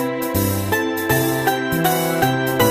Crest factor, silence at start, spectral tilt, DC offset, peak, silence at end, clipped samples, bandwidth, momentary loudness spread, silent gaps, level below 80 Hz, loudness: 16 dB; 0 s; -4.5 dB/octave; under 0.1%; -2 dBFS; 0 s; under 0.1%; 15.5 kHz; 3 LU; none; -44 dBFS; -19 LUFS